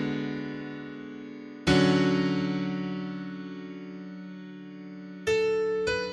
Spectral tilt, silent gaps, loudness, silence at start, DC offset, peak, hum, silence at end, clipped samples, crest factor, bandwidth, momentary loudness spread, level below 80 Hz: -6 dB/octave; none; -28 LUFS; 0 s; under 0.1%; -10 dBFS; none; 0 s; under 0.1%; 20 dB; 11.5 kHz; 19 LU; -54 dBFS